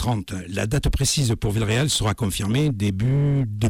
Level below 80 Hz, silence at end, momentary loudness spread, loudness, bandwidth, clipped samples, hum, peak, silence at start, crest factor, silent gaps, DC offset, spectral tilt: -34 dBFS; 0 s; 5 LU; -22 LUFS; 17 kHz; under 0.1%; none; -12 dBFS; 0 s; 10 dB; none; under 0.1%; -5 dB/octave